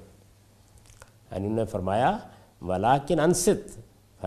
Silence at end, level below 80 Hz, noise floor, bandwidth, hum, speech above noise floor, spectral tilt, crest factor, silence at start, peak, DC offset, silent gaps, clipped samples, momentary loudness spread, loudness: 0 s; -52 dBFS; -57 dBFS; 14.5 kHz; none; 32 dB; -5 dB/octave; 20 dB; 0 s; -6 dBFS; under 0.1%; none; under 0.1%; 15 LU; -26 LUFS